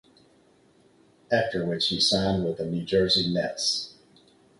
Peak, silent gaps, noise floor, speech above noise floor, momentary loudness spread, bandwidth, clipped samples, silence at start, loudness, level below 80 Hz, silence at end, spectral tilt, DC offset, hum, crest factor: -10 dBFS; none; -60 dBFS; 35 dB; 8 LU; 11.5 kHz; under 0.1%; 1.3 s; -25 LUFS; -54 dBFS; 0.7 s; -4 dB/octave; under 0.1%; none; 18 dB